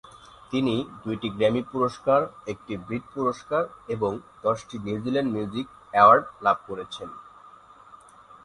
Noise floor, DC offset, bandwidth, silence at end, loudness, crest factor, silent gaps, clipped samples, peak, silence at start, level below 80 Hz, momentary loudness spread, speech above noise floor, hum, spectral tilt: -50 dBFS; under 0.1%; 11.5 kHz; 1.15 s; -25 LUFS; 22 dB; none; under 0.1%; -4 dBFS; 0.15 s; -60 dBFS; 16 LU; 25 dB; none; -6.5 dB/octave